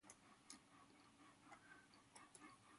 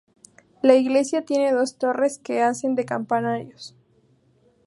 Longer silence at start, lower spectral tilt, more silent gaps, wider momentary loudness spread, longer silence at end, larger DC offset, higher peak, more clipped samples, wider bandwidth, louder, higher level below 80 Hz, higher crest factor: second, 0 s vs 0.65 s; second, -2 dB/octave vs -5 dB/octave; neither; second, 5 LU vs 12 LU; second, 0 s vs 1 s; neither; second, -42 dBFS vs -2 dBFS; neither; about the same, 11.5 kHz vs 11.5 kHz; second, -66 LUFS vs -22 LUFS; second, under -90 dBFS vs -74 dBFS; about the same, 24 dB vs 20 dB